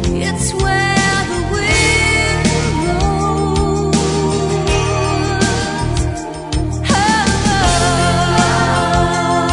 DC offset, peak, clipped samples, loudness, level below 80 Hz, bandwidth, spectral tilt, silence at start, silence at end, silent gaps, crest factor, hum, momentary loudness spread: under 0.1%; 0 dBFS; under 0.1%; -15 LUFS; -26 dBFS; 11 kHz; -4.5 dB/octave; 0 s; 0 s; none; 14 dB; none; 6 LU